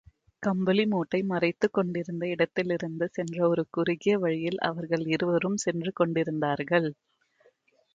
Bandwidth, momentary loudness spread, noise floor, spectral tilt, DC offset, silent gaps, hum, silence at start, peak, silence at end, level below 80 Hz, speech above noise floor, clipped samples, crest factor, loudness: 9.2 kHz; 5 LU; -65 dBFS; -6 dB/octave; under 0.1%; none; none; 0.4 s; -10 dBFS; 1 s; -68 dBFS; 38 dB; under 0.1%; 18 dB; -28 LUFS